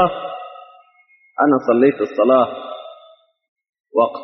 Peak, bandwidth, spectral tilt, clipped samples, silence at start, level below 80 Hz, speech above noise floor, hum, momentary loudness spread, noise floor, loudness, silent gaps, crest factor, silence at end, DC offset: 0 dBFS; 6 kHz; -5 dB/octave; under 0.1%; 0 s; -60 dBFS; 39 dB; none; 20 LU; -55 dBFS; -17 LUFS; 3.48-3.56 s, 3.69-3.73 s, 3.80-3.84 s; 18 dB; 0 s; under 0.1%